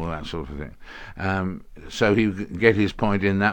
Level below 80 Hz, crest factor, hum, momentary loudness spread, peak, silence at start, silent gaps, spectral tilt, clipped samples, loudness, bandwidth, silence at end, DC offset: -42 dBFS; 22 dB; none; 19 LU; 0 dBFS; 0 s; none; -6.5 dB/octave; under 0.1%; -23 LUFS; 17.5 kHz; 0 s; under 0.1%